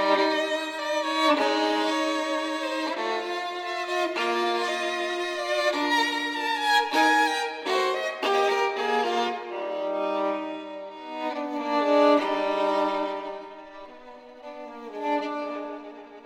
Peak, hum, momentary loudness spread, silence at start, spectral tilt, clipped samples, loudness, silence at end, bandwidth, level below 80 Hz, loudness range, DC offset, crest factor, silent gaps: -10 dBFS; none; 17 LU; 0 s; -2 dB/octave; under 0.1%; -25 LUFS; 0 s; 16 kHz; -72 dBFS; 5 LU; under 0.1%; 16 dB; none